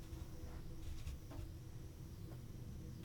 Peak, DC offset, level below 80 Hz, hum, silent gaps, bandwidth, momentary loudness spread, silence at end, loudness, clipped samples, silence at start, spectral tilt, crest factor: -36 dBFS; under 0.1%; -52 dBFS; none; none; 19.5 kHz; 3 LU; 0 s; -53 LUFS; under 0.1%; 0 s; -6 dB/octave; 14 dB